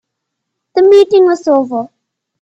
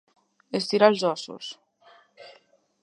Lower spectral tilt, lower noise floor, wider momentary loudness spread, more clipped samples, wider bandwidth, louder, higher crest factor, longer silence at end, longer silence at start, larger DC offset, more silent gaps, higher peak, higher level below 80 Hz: about the same, -5 dB/octave vs -4.5 dB/octave; first, -74 dBFS vs -60 dBFS; second, 14 LU vs 19 LU; neither; second, 8 kHz vs 11 kHz; first, -10 LUFS vs -24 LUFS; second, 12 dB vs 24 dB; about the same, 0.55 s vs 0.5 s; first, 0.75 s vs 0.55 s; neither; neither; first, 0 dBFS vs -4 dBFS; first, -62 dBFS vs -82 dBFS